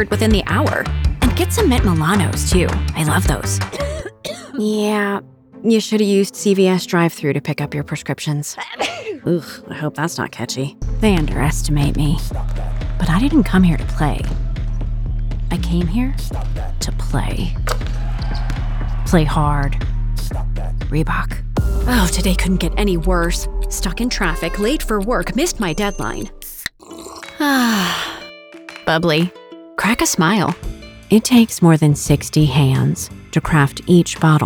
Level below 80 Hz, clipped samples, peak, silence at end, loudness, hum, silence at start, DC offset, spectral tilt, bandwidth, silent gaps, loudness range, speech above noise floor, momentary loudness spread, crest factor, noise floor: -24 dBFS; under 0.1%; 0 dBFS; 0 s; -18 LUFS; none; 0 s; under 0.1%; -5.5 dB/octave; over 20 kHz; none; 7 LU; 21 dB; 11 LU; 16 dB; -37 dBFS